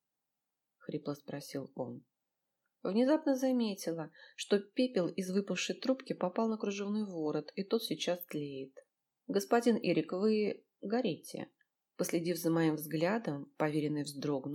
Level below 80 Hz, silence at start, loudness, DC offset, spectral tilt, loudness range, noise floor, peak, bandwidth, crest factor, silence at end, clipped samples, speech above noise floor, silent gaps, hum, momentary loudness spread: -88 dBFS; 0.9 s; -35 LUFS; under 0.1%; -5.5 dB/octave; 3 LU; -88 dBFS; -16 dBFS; 18 kHz; 20 dB; 0 s; under 0.1%; 54 dB; none; none; 13 LU